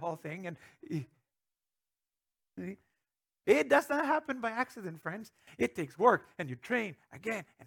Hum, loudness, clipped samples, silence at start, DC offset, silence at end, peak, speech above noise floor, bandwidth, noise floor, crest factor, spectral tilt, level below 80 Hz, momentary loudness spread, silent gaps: none; -33 LUFS; under 0.1%; 0 s; under 0.1%; 0 s; -10 dBFS; over 57 dB; 19.5 kHz; under -90 dBFS; 24 dB; -5.5 dB/octave; -76 dBFS; 18 LU; none